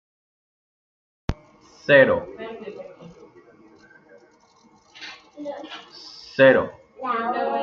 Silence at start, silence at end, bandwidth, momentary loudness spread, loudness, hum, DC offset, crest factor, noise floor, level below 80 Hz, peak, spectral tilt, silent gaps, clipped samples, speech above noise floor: 1.3 s; 0 s; 6.8 kHz; 24 LU; -20 LUFS; none; under 0.1%; 22 dB; -56 dBFS; -50 dBFS; -2 dBFS; -6 dB/octave; none; under 0.1%; 37 dB